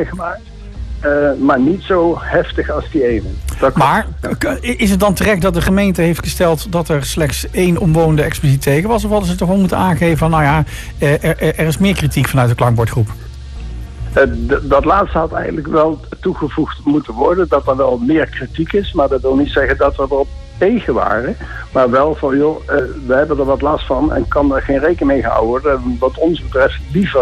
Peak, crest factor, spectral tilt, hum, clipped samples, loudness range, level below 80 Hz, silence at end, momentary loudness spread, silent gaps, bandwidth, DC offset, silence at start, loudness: -2 dBFS; 12 dB; -6.5 dB/octave; none; under 0.1%; 2 LU; -26 dBFS; 0 s; 8 LU; none; 14.5 kHz; under 0.1%; 0 s; -14 LUFS